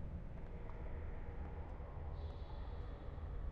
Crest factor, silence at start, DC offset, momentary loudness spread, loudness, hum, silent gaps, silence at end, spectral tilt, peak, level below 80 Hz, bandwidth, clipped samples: 12 dB; 0 s; under 0.1%; 2 LU; -50 LUFS; none; none; 0 s; -7.5 dB/octave; -34 dBFS; -48 dBFS; 5.2 kHz; under 0.1%